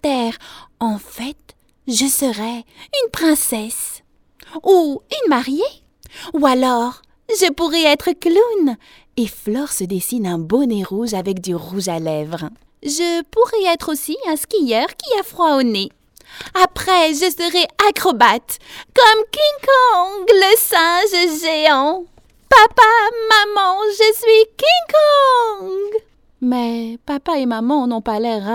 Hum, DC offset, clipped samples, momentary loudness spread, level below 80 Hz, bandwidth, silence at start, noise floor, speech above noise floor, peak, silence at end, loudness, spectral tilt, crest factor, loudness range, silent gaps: none; under 0.1%; under 0.1%; 14 LU; -50 dBFS; 18 kHz; 0.05 s; -51 dBFS; 36 dB; 0 dBFS; 0 s; -15 LUFS; -3 dB/octave; 16 dB; 8 LU; none